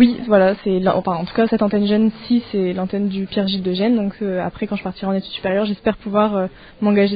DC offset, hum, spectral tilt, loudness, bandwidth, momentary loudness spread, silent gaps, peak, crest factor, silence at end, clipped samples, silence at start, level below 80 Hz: under 0.1%; none; -5.5 dB/octave; -19 LUFS; 5 kHz; 8 LU; none; 0 dBFS; 18 dB; 0 s; under 0.1%; 0 s; -48 dBFS